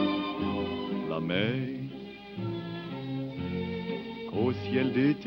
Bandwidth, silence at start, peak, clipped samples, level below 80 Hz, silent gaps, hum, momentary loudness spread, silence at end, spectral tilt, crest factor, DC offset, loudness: 16 kHz; 0 s; -14 dBFS; under 0.1%; -60 dBFS; none; none; 9 LU; 0 s; -8.5 dB/octave; 16 dB; under 0.1%; -32 LUFS